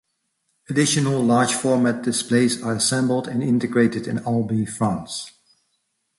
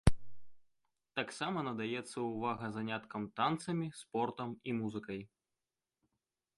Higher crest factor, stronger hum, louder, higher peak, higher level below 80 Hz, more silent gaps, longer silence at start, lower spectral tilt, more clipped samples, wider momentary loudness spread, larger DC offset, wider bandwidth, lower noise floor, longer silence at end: second, 16 dB vs 26 dB; neither; first, -21 LUFS vs -39 LUFS; first, -6 dBFS vs -12 dBFS; second, -58 dBFS vs -52 dBFS; neither; first, 0.7 s vs 0.05 s; second, -4.5 dB/octave vs -6 dB/octave; neither; about the same, 7 LU vs 8 LU; neither; about the same, 11.5 kHz vs 11.5 kHz; second, -72 dBFS vs under -90 dBFS; second, 0.9 s vs 1.3 s